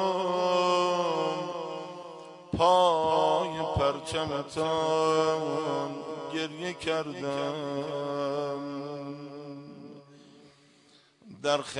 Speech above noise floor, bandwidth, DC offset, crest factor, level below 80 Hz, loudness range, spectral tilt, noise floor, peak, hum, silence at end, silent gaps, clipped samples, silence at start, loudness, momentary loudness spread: 32 dB; 11 kHz; under 0.1%; 18 dB; -60 dBFS; 10 LU; -5 dB/octave; -61 dBFS; -10 dBFS; none; 0 s; none; under 0.1%; 0 s; -29 LUFS; 17 LU